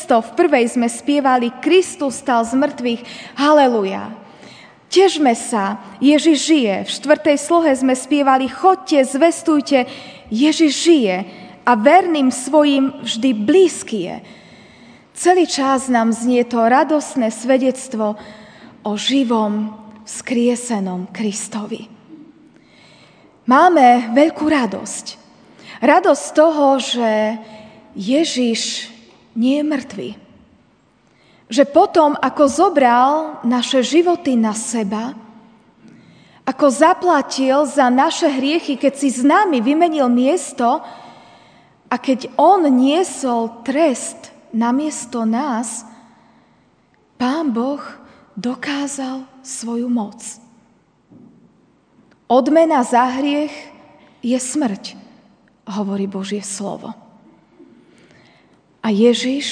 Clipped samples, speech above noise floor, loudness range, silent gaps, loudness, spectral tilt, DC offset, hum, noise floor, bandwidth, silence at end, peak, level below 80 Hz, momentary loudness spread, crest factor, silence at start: under 0.1%; 40 dB; 9 LU; none; -16 LUFS; -4 dB/octave; under 0.1%; none; -56 dBFS; 10 kHz; 0 s; 0 dBFS; -64 dBFS; 15 LU; 16 dB; 0 s